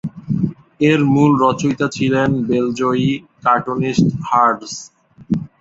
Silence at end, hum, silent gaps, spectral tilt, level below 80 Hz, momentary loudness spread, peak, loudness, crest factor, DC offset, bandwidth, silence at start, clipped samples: 0.15 s; none; none; -6.5 dB/octave; -50 dBFS; 10 LU; 0 dBFS; -17 LUFS; 16 dB; under 0.1%; 7.8 kHz; 0.05 s; under 0.1%